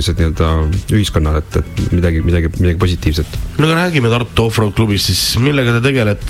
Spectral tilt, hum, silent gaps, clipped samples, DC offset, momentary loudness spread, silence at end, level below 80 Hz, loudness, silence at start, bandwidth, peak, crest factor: -5.5 dB/octave; none; none; under 0.1%; under 0.1%; 5 LU; 0 s; -22 dBFS; -14 LUFS; 0 s; 16 kHz; 0 dBFS; 14 dB